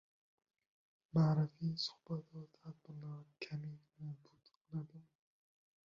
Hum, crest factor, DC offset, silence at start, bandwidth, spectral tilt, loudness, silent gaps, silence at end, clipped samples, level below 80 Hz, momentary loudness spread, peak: none; 20 dB; under 0.1%; 1.15 s; 7.2 kHz; -6.5 dB/octave; -41 LUFS; 4.57-4.65 s; 0.85 s; under 0.1%; -78 dBFS; 21 LU; -24 dBFS